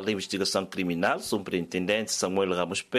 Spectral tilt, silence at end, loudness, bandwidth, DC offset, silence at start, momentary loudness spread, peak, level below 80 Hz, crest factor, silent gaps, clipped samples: -3.5 dB/octave; 0 s; -28 LUFS; 15 kHz; under 0.1%; 0 s; 3 LU; -10 dBFS; -66 dBFS; 18 dB; none; under 0.1%